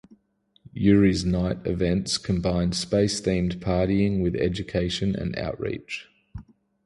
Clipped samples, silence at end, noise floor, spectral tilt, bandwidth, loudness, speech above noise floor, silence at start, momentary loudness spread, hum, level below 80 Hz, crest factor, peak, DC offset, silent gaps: under 0.1%; 0.45 s; -66 dBFS; -6 dB/octave; 11.5 kHz; -24 LUFS; 42 dB; 0.75 s; 15 LU; none; -40 dBFS; 18 dB; -6 dBFS; under 0.1%; none